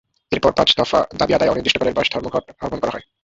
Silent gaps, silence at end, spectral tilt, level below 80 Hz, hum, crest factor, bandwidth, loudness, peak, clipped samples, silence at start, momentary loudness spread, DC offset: none; 0.2 s; -4.5 dB/octave; -44 dBFS; none; 18 dB; 8 kHz; -18 LUFS; -2 dBFS; under 0.1%; 0.3 s; 10 LU; under 0.1%